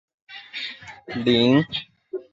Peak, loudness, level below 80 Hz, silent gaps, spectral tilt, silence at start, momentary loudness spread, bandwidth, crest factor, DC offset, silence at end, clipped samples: -6 dBFS; -22 LUFS; -58 dBFS; none; -6.5 dB/octave; 0.3 s; 22 LU; 7.6 kHz; 18 dB; under 0.1%; 0.1 s; under 0.1%